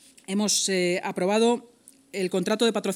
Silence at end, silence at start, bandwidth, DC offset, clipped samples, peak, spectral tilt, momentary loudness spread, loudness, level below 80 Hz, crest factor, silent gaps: 0 s; 0.3 s; 17 kHz; under 0.1%; under 0.1%; -10 dBFS; -3.5 dB/octave; 9 LU; -24 LUFS; -78 dBFS; 16 dB; none